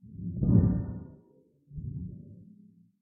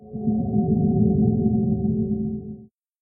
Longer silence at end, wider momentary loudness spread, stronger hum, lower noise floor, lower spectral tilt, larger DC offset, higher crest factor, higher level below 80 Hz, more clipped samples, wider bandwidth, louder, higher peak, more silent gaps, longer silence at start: first, 0.6 s vs 0.35 s; first, 24 LU vs 12 LU; neither; first, -63 dBFS vs -43 dBFS; second, -13.5 dB/octave vs -20 dB/octave; neither; first, 22 dB vs 14 dB; about the same, -42 dBFS vs -42 dBFS; neither; first, 2 kHz vs 0.8 kHz; second, -29 LUFS vs -22 LUFS; about the same, -10 dBFS vs -8 dBFS; neither; about the same, 0.05 s vs 0 s